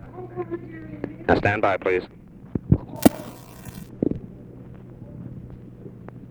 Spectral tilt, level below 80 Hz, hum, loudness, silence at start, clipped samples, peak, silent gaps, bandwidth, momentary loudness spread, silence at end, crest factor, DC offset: -6.5 dB/octave; -42 dBFS; none; -24 LUFS; 0 s; under 0.1%; 0 dBFS; none; over 20 kHz; 22 LU; 0 s; 26 dB; under 0.1%